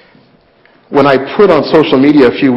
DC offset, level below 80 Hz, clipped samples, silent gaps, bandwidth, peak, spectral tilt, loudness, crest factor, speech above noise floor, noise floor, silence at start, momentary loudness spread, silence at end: under 0.1%; -44 dBFS; under 0.1%; none; 6.2 kHz; 0 dBFS; -8 dB/octave; -8 LUFS; 10 dB; 39 dB; -47 dBFS; 0.9 s; 3 LU; 0 s